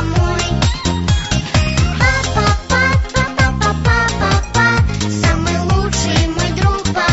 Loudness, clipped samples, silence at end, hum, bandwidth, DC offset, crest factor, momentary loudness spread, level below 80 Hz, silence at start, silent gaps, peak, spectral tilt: -15 LUFS; under 0.1%; 0 s; none; 8.2 kHz; 0.2%; 12 dB; 3 LU; -22 dBFS; 0 s; none; -2 dBFS; -4.5 dB/octave